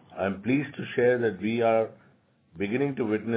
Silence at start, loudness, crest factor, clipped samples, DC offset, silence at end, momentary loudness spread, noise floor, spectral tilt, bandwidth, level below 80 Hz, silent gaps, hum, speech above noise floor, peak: 0.1 s; -27 LUFS; 16 dB; under 0.1%; under 0.1%; 0 s; 8 LU; -62 dBFS; -11 dB/octave; 4 kHz; -62 dBFS; none; none; 36 dB; -12 dBFS